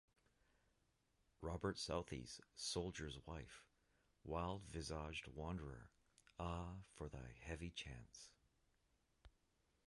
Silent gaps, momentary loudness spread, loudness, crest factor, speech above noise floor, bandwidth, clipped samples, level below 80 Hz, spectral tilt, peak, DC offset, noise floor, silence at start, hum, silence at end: none; 15 LU; -50 LUFS; 22 dB; 33 dB; 11.5 kHz; under 0.1%; -62 dBFS; -4.5 dB/octave; -30 dBFS; under 0.1%; -83 dBFS; 1.4 s; none; 0.6 s